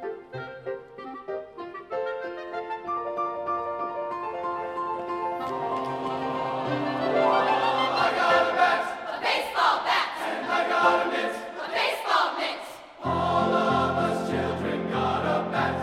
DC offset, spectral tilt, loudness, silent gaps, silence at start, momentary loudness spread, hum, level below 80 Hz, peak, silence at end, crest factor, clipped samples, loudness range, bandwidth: under 0.1%; -5 dB/octave; -26 LUFS; none; 0 s; 14 LU; none; -58 dBFS; -8 dBFS; 0 s; 20 dB; under 0.1%; 8 LU; 16 kHz